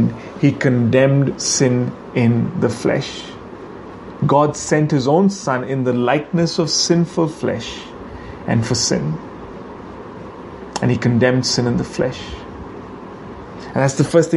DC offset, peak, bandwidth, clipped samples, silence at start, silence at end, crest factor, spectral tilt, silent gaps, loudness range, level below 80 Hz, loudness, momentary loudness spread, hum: under 0.1%; 0 dBFS; 11.5 kHz; under 0.1%; 0 s; 0 s; 18 dB; -5 dB/octave; none; 5 LU; -44 dBFS; -17 LUFS; 19 LU; none